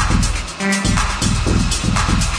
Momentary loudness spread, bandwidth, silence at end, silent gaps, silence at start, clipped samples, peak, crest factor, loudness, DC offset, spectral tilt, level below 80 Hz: 3 LU; 10.5 kHz; 0 s; none; 0 s; under 0.1%; -2 dBFS; 14 dB; -17 LUFS; under 0.1%; -4 dB/octave; -22 dBFS